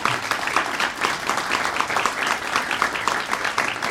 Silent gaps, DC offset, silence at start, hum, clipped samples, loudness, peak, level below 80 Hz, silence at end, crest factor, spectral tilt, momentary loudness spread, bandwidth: none; under 0.1%; 0 s; none; under 0.1%; -22 LUFS; -4 dBFS; -56 dBFS; 0 s; 20 dB; -1.5 dB/octave; 2 LU; 16.5 kHz